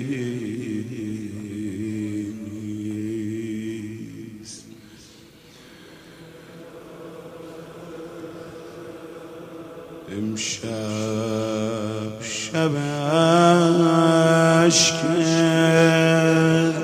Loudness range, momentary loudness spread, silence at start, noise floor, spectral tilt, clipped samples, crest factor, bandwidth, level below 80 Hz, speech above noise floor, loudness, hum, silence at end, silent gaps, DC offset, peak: 24 LU; 23 LU; 0 s; -48 dBFS; -5 dB/octave; under 0.1%; 22 dB; 15.5 kHz; -60 dBFS; 28 dB; -21 LUFS; none; 0 s; none; under 0.1%; -2 dBFS